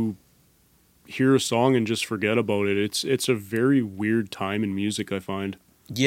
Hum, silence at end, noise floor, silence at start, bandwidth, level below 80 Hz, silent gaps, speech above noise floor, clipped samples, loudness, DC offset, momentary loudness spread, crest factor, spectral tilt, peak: none; 0 s; -61 dBFS; 0 s; 16.5 kHz; -66 dBFS; none; 37 dB; under 0.1%; -24 LUFS; under 0.1%; 10 LU; 18 dB; -5 dB/octave; -6 dBFS